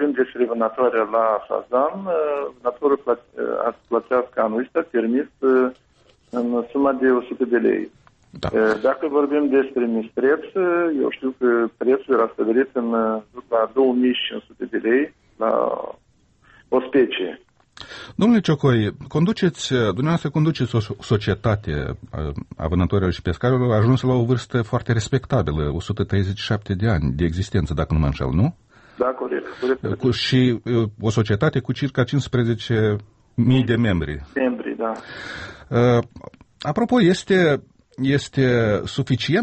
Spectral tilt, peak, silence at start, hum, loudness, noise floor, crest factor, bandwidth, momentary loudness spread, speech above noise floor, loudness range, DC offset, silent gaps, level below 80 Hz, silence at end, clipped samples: -7 dB/octave; -6 dBFS; 0 s; none; -21 LUFS; -56 dBFS; 14 dB; 8.4 kHz; 9 LU; 36 dB; 2 LU; under 0.1%; none; -40 dBFS; 0 s; under 0.1%